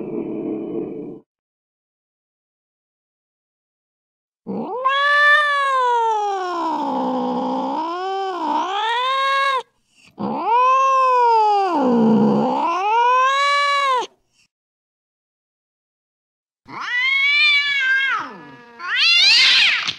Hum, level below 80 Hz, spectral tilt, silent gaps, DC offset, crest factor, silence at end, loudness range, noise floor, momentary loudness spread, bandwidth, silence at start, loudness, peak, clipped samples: none; -70 dBFS; -3 dB/octave; 1.26-4.32 s, 14.51-16.47 s; under 0.1%; 14 dB; 0 s; 11 LU; -55 dBFS; 15 LU; 12.5 kHz; 0 s; -16 LUFS; -4 dBFS; under 0.1%